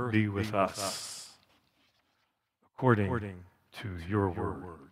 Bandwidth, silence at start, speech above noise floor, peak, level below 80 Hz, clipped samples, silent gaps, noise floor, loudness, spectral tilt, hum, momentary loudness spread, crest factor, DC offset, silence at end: 15.5 kHz; 0 s; 47 dB; -10 dBFS; -60 dBFS; under 0.1%; none; -78 dBFS; -32 LUFS; -5.5 dB/octave; none; 17 LU; 24 dB; under 0.1%; 0.05 s